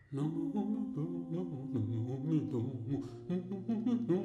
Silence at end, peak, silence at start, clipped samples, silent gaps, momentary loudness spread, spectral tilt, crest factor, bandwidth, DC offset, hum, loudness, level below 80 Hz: 0 s; -22 dBFS; 0.1 s; under 0.1%; none; 5 LU; -10 dB/octave; 14 dB; 9.6 kHz; under 0.1%; none; -37 LUFS; -68 dBFS